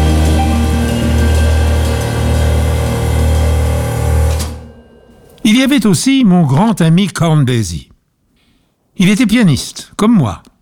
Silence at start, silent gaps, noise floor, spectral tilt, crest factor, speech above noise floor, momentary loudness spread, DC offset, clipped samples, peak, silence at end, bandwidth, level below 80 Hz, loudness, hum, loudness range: 0 s; none; -57 dBFS; -6 dB/octave; 10 dB; 47 dB; 7 LU; under 0.1%; under 0.1%; -2 dBFS; 0.25 s; 16 kHz; -18 dBFS; -12 LUFS; none; 3 LU